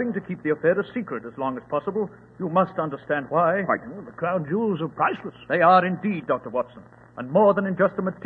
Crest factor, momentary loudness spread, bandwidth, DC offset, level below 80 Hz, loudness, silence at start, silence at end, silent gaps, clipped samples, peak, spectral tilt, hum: 18 dB; 13 LU; 4.7 kHz; under 0.1%; -64 dBFS; -24 LUFS; 0 s; 0 s; none; under 0.1%; -4 dBFS; -9.5 dB/octave; none